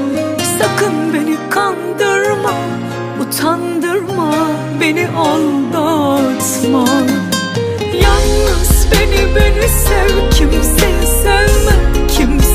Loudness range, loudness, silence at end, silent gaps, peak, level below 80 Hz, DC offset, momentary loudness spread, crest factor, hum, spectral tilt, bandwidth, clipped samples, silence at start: 4 LU; -13 LUFS; 0 s; none; 0 dBFS; -16 dBFS; under 0.1%; 6 LU; 12 dB; none; -4.5 dB/octave; 15.5 kHz; under 0.1%; 0 s